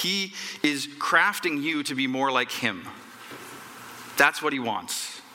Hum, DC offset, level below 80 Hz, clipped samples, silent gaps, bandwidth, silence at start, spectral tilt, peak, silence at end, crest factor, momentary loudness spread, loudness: none; under 0.1%; -74 dBFS; under 0.1%; none; 17 kHz; 0 s; -2.5 dB/octave; -4 dBFS; 0 s; 22 dB; 20 LU; -25 LUFS